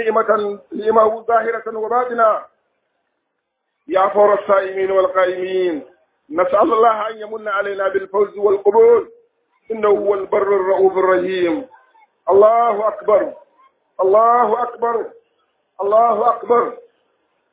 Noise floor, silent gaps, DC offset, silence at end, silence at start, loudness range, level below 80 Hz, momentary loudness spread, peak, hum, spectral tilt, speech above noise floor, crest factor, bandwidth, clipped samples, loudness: -74 dBFS; none; under 0.1%; 0.7 s; 0 s; 3 LU; -62 dBFS; 11 LU; 0 dBFS; none; -9 dB/octave; 58 dB; 16 dB; 4 kHz; under 0.1%; -16 LUFS